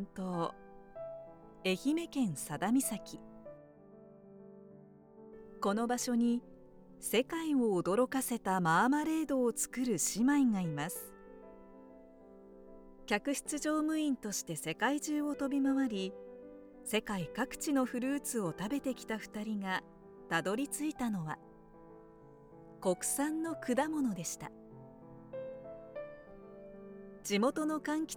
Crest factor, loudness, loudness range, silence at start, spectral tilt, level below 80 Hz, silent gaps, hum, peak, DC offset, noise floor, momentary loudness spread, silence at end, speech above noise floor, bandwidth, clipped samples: 20 dB; -35 LUFS; 8 LU; 0 s; -4 dB/octave; -66 dBFS; none; none; -16 dBFS; under 0.1%; -57 dBFS; 22 LU; 0 s; 23 dB; over 20 kHz; under 0.1%